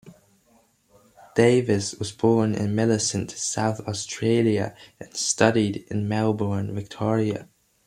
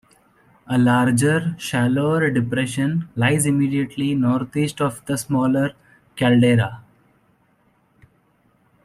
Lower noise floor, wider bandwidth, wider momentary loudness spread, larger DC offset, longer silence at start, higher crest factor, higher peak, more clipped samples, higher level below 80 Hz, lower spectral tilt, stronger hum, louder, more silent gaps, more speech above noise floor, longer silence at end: about the same, -61 dBFS vs -61 dBFS; about the same, 13 kHz vs 13.5 kHz; first, 10 LU vs 7 LU; neither; second, 0.05 s vs 0.7 s; first, 20 dB vs 14 dB; about the same, -4 dBFS vs -6 dBFS; neither; about the same, -60 dBFS vs -56 dBFS; about the same, -5 dB/octave vs -6 dB/octave; neither; second, -24 LUFS vs -20 LUFS; neither; second, 38 dB vs 42 dB; second, 0.45 s vs 2.05 s